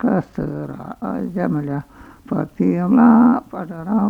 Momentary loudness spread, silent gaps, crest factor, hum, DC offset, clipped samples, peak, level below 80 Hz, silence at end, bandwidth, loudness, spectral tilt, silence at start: 17 LU; none; 16 dB; none; under 0.1%; under 0.1%; -2 dBFS; -50 dBFS; 0 s; 2.9 kHz; -18 LUFS; -10.5 dB/octave; 0 s